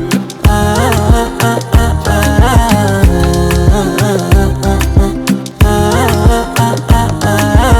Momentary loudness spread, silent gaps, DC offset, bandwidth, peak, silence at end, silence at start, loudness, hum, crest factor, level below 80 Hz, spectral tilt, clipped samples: 3 LU; none; under 0.1%; over 20 kHz; 0 dBFS; 0 s; 0 s; -11 LUFS; none; 10 dB; -14 dBFS; -5.5 dB/octave; 0.9%